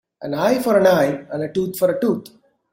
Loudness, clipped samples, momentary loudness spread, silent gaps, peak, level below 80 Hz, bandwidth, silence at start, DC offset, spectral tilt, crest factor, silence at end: -19 LUFS; under 0.1%; 11 LU; none; -2 dBFS; -60 dBFS; 16.5 kHz; 0.2 s; under 0.1%; -6 dB/octave; 16 dB; 0.45 s